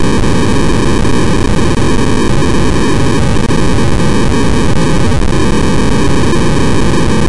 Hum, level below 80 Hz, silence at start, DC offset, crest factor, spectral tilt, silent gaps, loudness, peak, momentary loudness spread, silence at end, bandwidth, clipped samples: none; -18 dBFS; 0 s; 30%; 4 dB; -6 dB/octave; none; -11 LUFS; -2 dBFS; 1 LU; 0 s; 11.5 kHz; under 0.1%